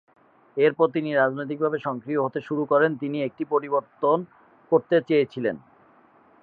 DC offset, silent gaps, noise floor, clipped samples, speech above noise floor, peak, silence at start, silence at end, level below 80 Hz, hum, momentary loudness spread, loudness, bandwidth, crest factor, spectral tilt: under 0.1%; none; -56 dBFS; under 0.1%; 33 dB; -6 dBFS; 0.55 s; 0.85 s; -74 dBFS; none; 8 LU; -24 LUFS; 4.9 kHz; 18 dB; -9 dB/octave